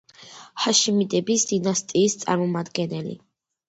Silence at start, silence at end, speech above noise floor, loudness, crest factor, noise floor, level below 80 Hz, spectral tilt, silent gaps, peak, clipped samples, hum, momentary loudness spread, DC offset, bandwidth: 0.2 s; 0.5 s; 23 dB; -22 LUFS; 18 dB; -46 dBFS; -66 dBFS; -3.5 dB/octave; none; -6 dBFS; under 0.1%; none; 17 LU; under 0.1%; 8.8 kHz